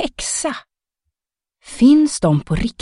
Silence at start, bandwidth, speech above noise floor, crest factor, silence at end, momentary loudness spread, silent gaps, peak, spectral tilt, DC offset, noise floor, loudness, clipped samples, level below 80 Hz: 0 s; 11.5 kHz; 71 dB; 16 dB; 0.1 s; 16 LU; none; -2 dBFS; -5 dB/octave; under 0.1%; -87 dBFS; -16 LUFS; under 0.1%; -38 dBFS